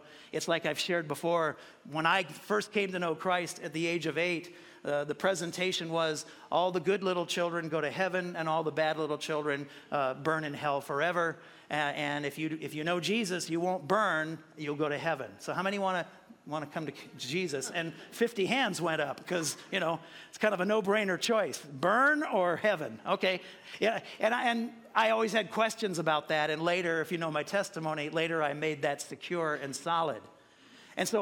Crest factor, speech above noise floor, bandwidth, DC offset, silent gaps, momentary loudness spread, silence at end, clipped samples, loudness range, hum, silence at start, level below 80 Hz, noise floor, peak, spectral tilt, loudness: 20 dB; 26 dB; 17 kHz; under 0.1%; none; 9 LU; 0 s; under 0.1%; 4 LU; none; 0 s; -80 dBFS; -58 dBFS; -12 dBFS; -4 dB/octave; -32 LUFS